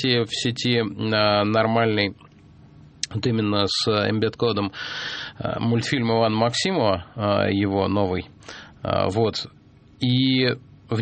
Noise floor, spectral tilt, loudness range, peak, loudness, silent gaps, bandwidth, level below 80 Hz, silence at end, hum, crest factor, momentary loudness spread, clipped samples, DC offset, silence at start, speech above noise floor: -49 dBFS; -5.5 dB/octave; 2 LU; -4 dBFS; -22 LUFS; none; 8.8 kHz; -54 dBFS; 0 s; none; 20 dB; 10 LU; under 0.1%; under 0.1%; 0 s; 27 dB